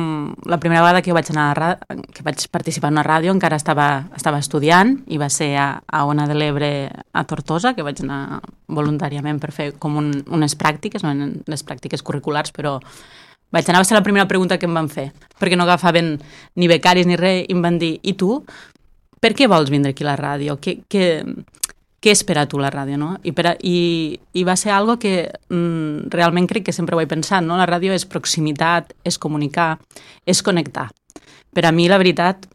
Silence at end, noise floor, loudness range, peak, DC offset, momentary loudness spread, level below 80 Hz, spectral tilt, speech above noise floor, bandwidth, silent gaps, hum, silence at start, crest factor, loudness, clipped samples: 0.1 s; -53 dBFS; 5 LU; 0 dBFS; under 0.1%; 12 LU; -52 dBFS; -4.5 dB/octave; 35 dB; 14.5 kHz; none; none; 0 s; 18 dB; -18 LUFS; under 0.1%